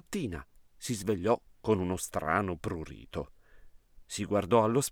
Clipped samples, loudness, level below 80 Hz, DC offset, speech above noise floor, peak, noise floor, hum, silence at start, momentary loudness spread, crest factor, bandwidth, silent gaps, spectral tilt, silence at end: under 0.1%; -32 LUFS; -54 dBFS; under 0.1%; 24 dB; -10 dBFS; -54 dBFS; none; 0.1 s; 15 LU; 22 dB; 19 kHz; none; -5 dB/octave; 0 s